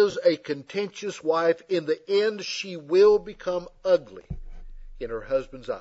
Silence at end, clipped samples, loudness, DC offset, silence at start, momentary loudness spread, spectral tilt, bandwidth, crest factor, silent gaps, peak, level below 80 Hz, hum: 0 s; under 0.1%; -25 LUFS; under 0.1%; 0 s; 15 LU; -4.5 dB/octave; 8 kHz; 16 dB; none; -8 dBFS; -46 dBFS; none